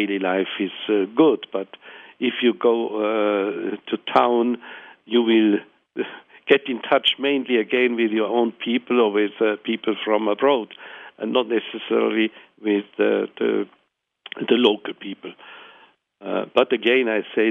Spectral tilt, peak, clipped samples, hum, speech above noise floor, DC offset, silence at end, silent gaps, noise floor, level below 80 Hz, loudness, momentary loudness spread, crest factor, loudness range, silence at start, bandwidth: -7 dB/octave; -2 dBFS; under 0.1%; none; 39 dB; under 0.1%; 0 s; none; -60 dBFS; -74 dBFS; -21 LUFS; 16 LU; 20 dB; 3 LU; 0 s; 4.8 kHz